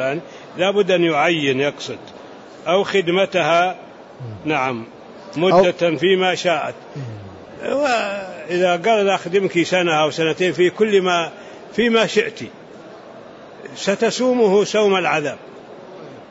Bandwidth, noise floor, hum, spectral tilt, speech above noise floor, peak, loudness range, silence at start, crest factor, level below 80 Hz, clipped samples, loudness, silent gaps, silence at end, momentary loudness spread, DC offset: 8 kHz; -39 dBFS; none; -4.5 dB/octave; 21 dB; -4 dBFS; 3 LU; 0 s; 16 dB; -62 dBFS; under 0.1%; -18 LUFS; none; 0.05 s; 22 LU; under 0.1%